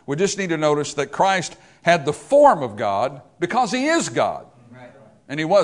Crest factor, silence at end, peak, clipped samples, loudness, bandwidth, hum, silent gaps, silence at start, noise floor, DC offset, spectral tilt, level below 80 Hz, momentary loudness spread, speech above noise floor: 20 dB; 0 s; 0 dBFS; under 0.1%; -20 LUFS; 11 kHz; none; none; 0.1 s; -45 dBFS; under 0.1%; -4.5 dB/octave; -60 dBFS; 12 LU; 26 dB